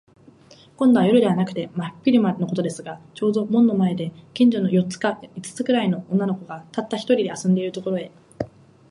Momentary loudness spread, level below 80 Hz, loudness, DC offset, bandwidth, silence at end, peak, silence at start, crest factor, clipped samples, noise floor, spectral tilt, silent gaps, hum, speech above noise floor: 16 LU; -62 dBFS; -21 LUFS; under 0.1%; 11.5 kHz; 0.45 s; -4 dBFS; 0.8 s; 16 dB; under 0.1%; -50 dBFS; -7 dB/octave; none; none; 29 dB